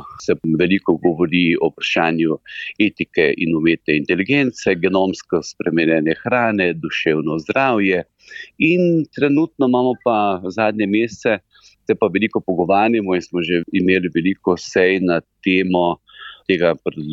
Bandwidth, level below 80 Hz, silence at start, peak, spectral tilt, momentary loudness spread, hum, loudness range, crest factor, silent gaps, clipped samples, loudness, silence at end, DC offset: 7.8 kHz; -56 dBFS; 0 s; -4 dBFS; -6 dB/octave; 6 LU; none; 1 LU; 14 dB; none; under 0.1%; -18 LUFS; 0 s; under 0.1%